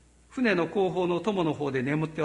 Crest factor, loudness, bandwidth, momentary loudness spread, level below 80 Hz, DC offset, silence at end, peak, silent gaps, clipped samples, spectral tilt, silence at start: 16 dB; -27 LUFS; 11 kHz; 4 LU; -60 dBFS; under 0.1%; 0 s; -12 dBFS; none; under 0.1%; -7 dB/octave; 0.3 s